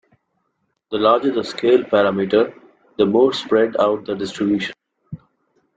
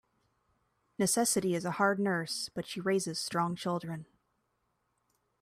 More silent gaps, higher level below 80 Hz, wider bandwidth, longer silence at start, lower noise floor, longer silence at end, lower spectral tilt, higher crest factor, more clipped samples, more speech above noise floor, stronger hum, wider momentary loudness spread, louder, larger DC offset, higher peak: neither; first, -62 dBFS vs -72 dBFS; second, 9 kHz vs 15.5 kHz; about the same, 0.9 s vs 1 s; second, -71 dBFS vs -79 dBFS; second, 0.6 s vs 1.4 s; first, -6 dB/octave vs -4 dB/octave; about the same, 16 dB vs 20 dB; neither; first, 54 dB vs 47 dB; neither; first, 19 LU vs 9 LU; first, -18 LUFS vs -32 LUFS; neither; first, -2 dBFS vs -14 dBFS